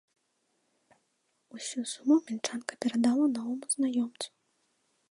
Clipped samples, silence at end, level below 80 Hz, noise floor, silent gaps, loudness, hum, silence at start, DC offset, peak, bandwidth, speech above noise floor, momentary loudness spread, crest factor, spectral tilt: under 0.1%; 0.85 s; -82 dBFS; -76 dBFS; none; -30 LUFS; none; 1.55 s; under 0.1%; -12 dBFS; 11.5 kHz; 47 dB; 14 LU; 20 dB; -3 dB/octave